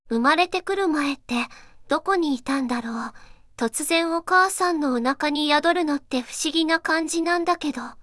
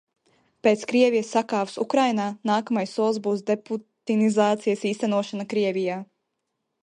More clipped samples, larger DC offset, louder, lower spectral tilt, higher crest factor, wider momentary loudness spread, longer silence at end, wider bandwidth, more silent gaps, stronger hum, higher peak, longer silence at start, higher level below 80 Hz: neither; neither; about the same, -23 LUFS vs -24 LUFS; second, -2 dB/octave vs -5.5 dB/octave; about the same, 16 dB vs 18 dB; about the same, 8 LU vs 7 LU; second, 0 s vs 0.8 s; first, 12 kHz vs 10.5 kHz; neither; neither; about the same, -6 dBFS vs -6 dBFS; second, 0.05 s vs 0.65 s; first, -56 dBFS vs -76 dBFS